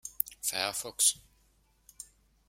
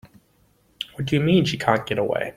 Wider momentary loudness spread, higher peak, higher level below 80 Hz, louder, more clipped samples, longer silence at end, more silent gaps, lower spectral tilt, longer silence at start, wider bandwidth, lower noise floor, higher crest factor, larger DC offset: first, 23 LU vs 14 LU; about the same, -2 dBFS vs -2 dBFS; second, -68 dBFS vs -54 dBFS; second, -29 LUFS vs -21 LUFS; neither; first, 0.45 s vs 0.05 s; neither; second, 1 dB/octave vs -6.5 dB/octave; about the same, 0.05 s vs 0.05 s; about the same, 16.5 kHz vs 15.5 kHz; first, -68 dBFS vs -61 dBFS; first, 34 dB vs 20 dB; neither